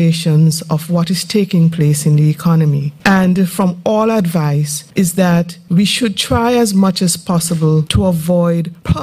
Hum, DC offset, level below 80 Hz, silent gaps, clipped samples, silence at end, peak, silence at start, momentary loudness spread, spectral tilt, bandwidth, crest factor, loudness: none; under 0.1%; -36 dBFS; none; under 0.1%; 0 s; 0 dBFS; 0 s; 4 LU; -5.5 dB/octave; 15.5 kHz; 12 dB; -13 LUFS